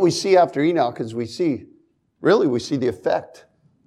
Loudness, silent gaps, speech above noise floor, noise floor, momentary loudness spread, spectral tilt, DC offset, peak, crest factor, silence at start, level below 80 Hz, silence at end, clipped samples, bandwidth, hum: -20 LUFS; none; 40 dB; -59 dBFS; 10 LU; -5.5 dB/octave; under 0.1%; -4 dBFS; 16 dB; 0 s; -64 dBFS; 0.6 s; under 0.1%; 12 kHz; none